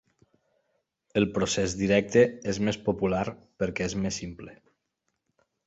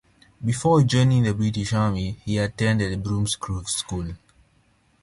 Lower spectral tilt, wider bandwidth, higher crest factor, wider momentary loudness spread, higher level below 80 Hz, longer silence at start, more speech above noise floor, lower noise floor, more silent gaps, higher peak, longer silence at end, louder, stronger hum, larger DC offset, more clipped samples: about the same, -5 dB/octave vs -5.5 dB/octave; second, 8.2 kHz vs 11.5 kHz; first, 22 dB vs 16 dB; about the same, 13 LU vs 12 LU; second, -52 dBFS vs -44 dBFS; first, 1.15 s vs 0.4 s; first, 53 dB vs 40 dB; first, -80 dBFS vs -62 dBFS; neither; about the same, -8 dBFS vs -6 dBFS; first, 1.15 s vs 0.85 s; second, -27 LUFS vs -23 LUFS; neither; neither; neither